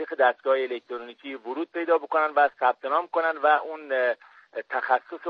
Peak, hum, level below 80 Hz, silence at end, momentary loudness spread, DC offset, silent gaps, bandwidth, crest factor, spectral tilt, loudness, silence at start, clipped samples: -8 dBFS; none; -86 dBFS; 0 s; 15 LU; under 0.1%; none; 5.4 kHz; 18 dB; -4.5 dB/octave; -25 LUFS; 0 s; under 0.1%